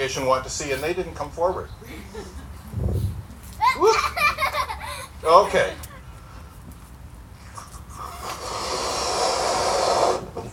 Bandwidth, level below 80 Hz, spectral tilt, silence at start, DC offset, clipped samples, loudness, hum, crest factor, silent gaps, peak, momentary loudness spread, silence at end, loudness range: 19 kHz; -40 dBFS; -3.5 dB/octave; 0 s; under 0.1%; under 0.1%; -23 LUFS; none; 24 dB; none; 0 dBFS; 23 LU; 0 s; 9 LU